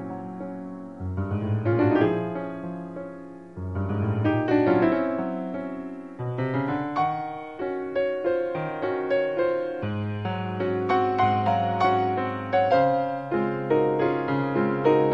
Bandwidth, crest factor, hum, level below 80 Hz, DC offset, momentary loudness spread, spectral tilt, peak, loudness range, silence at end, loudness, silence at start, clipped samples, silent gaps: 7.2 kHz; 18 dB; none; -58 dBFS; 0.1%; 14 LU; -9 dB/octave; -8 dBFS; 4 LU; 0 s; -25 LUFS; 0 s; under 0.1%; none